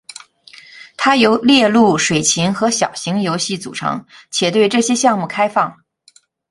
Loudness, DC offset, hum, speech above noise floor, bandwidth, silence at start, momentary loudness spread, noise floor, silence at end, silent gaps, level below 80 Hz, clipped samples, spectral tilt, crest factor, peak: -15 LUFS; under 0.1%; none; 37 dB; 11.5 kHz; 0.75 s; 11 LU; -52 dBFS; 0.75 s; none; -58 dBFS; under 0.1%; -3.5 dB/octave; 16 dB; 0 dBFS